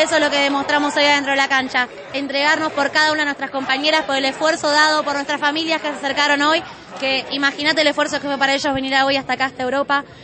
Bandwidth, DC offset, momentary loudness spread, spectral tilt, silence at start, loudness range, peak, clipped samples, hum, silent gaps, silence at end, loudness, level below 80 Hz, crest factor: 8.8 kHz; under 0.1%; 6 LU; -2 dB/octave; 0 s; 1 LU; -2 dBFS; under 0.1%; none; none; 0 s; -17 LUFS; -56 dBFS; 16 dB